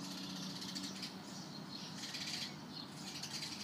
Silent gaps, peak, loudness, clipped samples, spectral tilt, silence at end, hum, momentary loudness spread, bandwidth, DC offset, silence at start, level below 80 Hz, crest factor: none; -30 dBFS; -44 LUFS; under 0.1%; -2.5 dB/octave; 0 s; none; 6 LU; 15.5 kHz; under 0.1%; 0 s; -82 dBFS; 16 dB